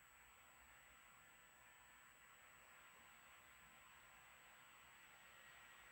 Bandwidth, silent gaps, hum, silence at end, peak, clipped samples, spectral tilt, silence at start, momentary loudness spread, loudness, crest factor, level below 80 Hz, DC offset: over 20 kHz; none; none; 0 s; -52 dBFS; under 0.1%; -1 dB/octave; 0 s; 3 LU; -65 LUFS; 14 dB; -84 dBFS; under 0.1%